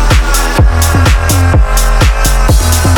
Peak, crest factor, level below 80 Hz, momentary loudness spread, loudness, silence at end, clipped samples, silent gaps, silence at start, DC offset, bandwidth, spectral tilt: 0 dBFS; 8 dB; -10 dBFS; 2 LU; -9 LUFS; 0 s; under 0.1%; none; 0 s; under 0.1%; 19 kHz; -4.5 dB/octave